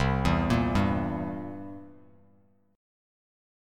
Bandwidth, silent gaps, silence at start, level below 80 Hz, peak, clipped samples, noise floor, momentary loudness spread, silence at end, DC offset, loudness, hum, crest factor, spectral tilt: 14.5 kHz; none; 0 s; -40 dBFS; -10 dBFS; under 0.1%; -64 dBFS; 17 LU; 1.85 s; under 0.1%; -28 LUFS; none; 20 dB; -7 dB/octave